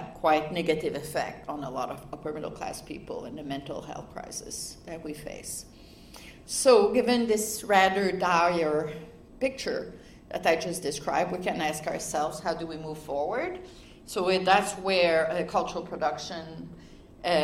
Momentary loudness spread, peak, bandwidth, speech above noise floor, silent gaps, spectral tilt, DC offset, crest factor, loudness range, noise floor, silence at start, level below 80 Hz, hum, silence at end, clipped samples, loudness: 17 LU; -6 dBFS; 16 kHz; 20 dB; none; -3.5 dB/octave; under 0.1%; 22 dB; 13 LU; -48 dBFS; 0 s; -56 dBFS; none; 0 s; under 0.1%; -28 LUFS